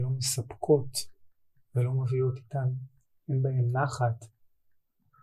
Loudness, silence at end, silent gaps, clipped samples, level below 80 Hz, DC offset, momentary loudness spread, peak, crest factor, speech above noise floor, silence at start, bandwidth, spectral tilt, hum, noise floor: -30 LUFS; 0.95 s; none; under 0.1%; -64 dBFS; under 0.1%; 14 LU; -10 dBFS; 20 dB; 40 dB; 0 s; 15.5 kHz; -5.5 dB/octave; none; -68 dBFS